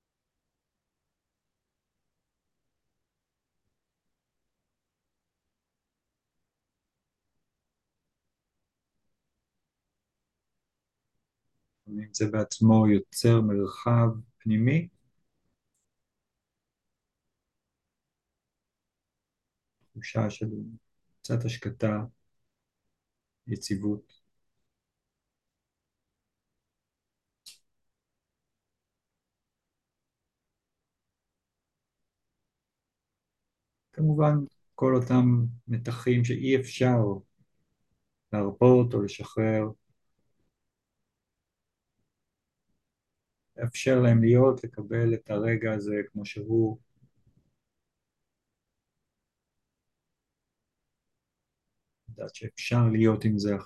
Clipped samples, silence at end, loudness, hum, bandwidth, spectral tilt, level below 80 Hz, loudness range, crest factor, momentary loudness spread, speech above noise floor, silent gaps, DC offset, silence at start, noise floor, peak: under 0.1%; 0 s; -26 LUFS; none; 12.5 kHz; -7.5 dB/octave; -62 dBFS; 14 LU; 22 dB; 17 LU; 62 dB; none; under 0.1%; 11.9 s; -87 dBFS; -8 dBFS